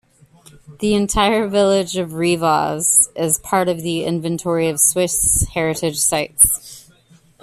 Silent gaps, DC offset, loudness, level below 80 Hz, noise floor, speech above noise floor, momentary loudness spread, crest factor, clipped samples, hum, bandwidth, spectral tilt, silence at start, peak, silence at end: none; under 0.1%; -16 LUFS; -38 dBFS; -51 dBFS; 34 dB; 8 LU; 18 dB; under 0.1%; none; 15 kHz; -3 dB/octave; 0.7 s; 0 dBFS; 0.6 s